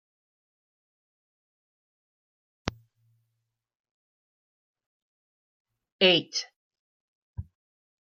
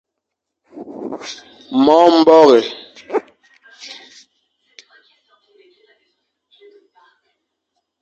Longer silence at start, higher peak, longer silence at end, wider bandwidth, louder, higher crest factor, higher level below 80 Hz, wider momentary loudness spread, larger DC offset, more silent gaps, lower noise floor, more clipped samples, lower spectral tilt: first, 2.65 s vs 0.75 s; second, -8 dBFS vs 0 dBFS; second, 0.6 s vs 4.15 s; about the same, 7.2 kHz vs 7.8 kHz; second, -24 LUFS vs -12 LUFS; first, 28 dB vs 18 dB; first, -60 dBFS vs -66 dBFS; second, 23 LU vs 26 LU; neither; first, 3.75-3.84 s, 3.91-4.74 s, 4.86-5.65 s, 5.92-5.99 s, 6.56-6.71 s, 6.79-7.34 s vs none; about the same, -82 dBFS vs -79 dBFS; neither; about the same, -3.5 dB/octave vs -4.5 dB/octave